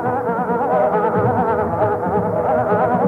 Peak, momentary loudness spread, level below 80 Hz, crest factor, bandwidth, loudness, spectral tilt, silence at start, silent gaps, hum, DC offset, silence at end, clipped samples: -6 dBFS; 3 LU; -50 dBFS; 12 dB; 12 kHz; -18 LUFS; -10 dB/octave; 0 s; none; none; under 0.1%; 0 s; under 0.1%